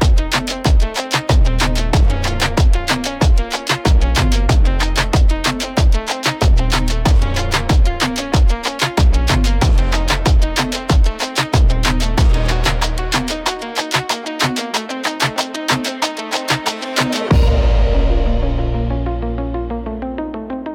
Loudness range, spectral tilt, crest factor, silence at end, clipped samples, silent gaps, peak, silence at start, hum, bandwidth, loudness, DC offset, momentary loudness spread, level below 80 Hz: 3 LU; -4.5 dB/octave; 12 dB; 0 s; under 0.1%; none; -2 dBFS; 0 s; none; 16 kHz; -17 LUFS; under 0.1%; 6 LU; -16 dBFS